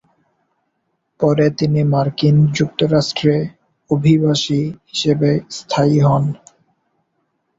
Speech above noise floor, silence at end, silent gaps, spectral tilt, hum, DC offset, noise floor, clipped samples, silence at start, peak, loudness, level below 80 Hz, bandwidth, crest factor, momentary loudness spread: 55 dB; 1.25 s; none; -6.5 dB/octave; none; under 0.1%; -70 dBFS; under 0.1%; 1.2 s; -2 dBFS; -16 LUFS; -52 dBFS; 7.8 kHz; 16 dB; 8 LU